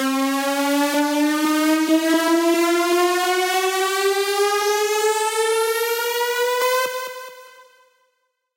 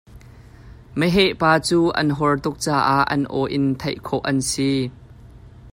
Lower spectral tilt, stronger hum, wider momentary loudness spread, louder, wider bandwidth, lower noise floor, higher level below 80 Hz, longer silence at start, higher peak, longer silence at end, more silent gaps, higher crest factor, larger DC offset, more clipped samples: second, -0.5 dB/octave vs -5 dB/octave; neither; second, 3 LU vs 8 LU; about the same, -19 LUFS vs -20 LUFS; about the same, 16 kHz vs 16 kHz; first, -71 dBFS vs -44 dBFS; second, under -90 dBFS vs -46 dBFS; about the same, 0 s vs 0.1 s; second, -8 dBFS vs -4 dBFS; first, 1.05 s vs 0 s; neither; second, 12 dB vs 18 dB; neither; neither